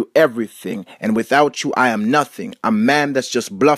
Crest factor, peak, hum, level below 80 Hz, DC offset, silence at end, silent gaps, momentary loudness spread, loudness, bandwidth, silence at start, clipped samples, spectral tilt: 16 dB; 0 dBFS; none; -64 dBFS; under 0.1%; 0 s; none; 11 LU; -17 LUFS; 15.5 kHz; 0 s; under 0.1%; -4.5 dB/octave